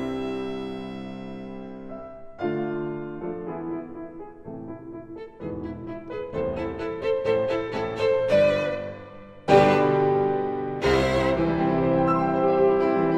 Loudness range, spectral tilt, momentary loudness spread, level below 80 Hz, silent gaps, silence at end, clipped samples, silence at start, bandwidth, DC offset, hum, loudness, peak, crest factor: 12 LU; -7 dB/octave; 19 LU; -48 dBFS; none; 0 s; under 0.1%; 0 s; 10 kHz; 0.1%; none; -24 LUFS; -4 dBFS; 22 dB